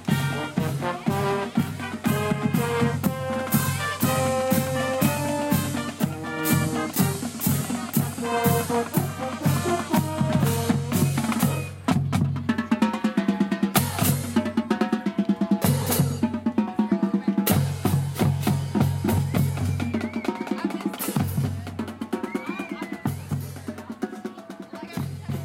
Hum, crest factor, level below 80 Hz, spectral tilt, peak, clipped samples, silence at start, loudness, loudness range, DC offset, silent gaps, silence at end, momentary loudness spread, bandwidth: none; 20 dB; -54 dBFS; -5.5 dB/octave; -6 dBFS; under 0.1%; 0 s; -25 LUFS; 5 LU; under 0.1%; none; 0 s; 9 LU; 16.5 kHz